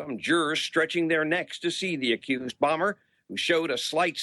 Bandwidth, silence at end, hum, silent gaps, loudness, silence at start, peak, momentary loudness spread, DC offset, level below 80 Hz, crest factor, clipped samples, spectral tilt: 12.5 kHz; 0 s; none; none; -26 LUFS; 0 s; -10 dBFS; 6 LU; under 0.1%; -72 dBFS; 16 dB; under 0.1%; -3.5 dB/octave